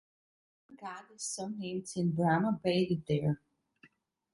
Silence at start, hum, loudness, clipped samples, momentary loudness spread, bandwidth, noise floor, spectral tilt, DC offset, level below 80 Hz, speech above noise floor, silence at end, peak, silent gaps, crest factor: 0.7 s; none; -33 LUFS; under 0.1%; 16 LU; 11.5 kHz; -66 dBFS; -5.5 dB/octave; under 0.1%; -68 dBFS; 33 dB; 0.95 s; -16 dBFS; none; 20 dB